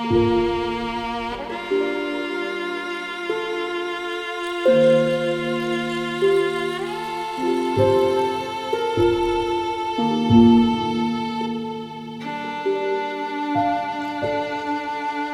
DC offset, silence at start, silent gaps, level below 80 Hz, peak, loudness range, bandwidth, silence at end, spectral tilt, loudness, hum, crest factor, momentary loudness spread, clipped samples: under 0.1%; 0 s; none; -48 dBFS; -4 dBFS; 6 LU; 13 kHz; 0 s; -6 dB/octave; -22 LUFS; none; 18 dB; 10 LU; under 0.1%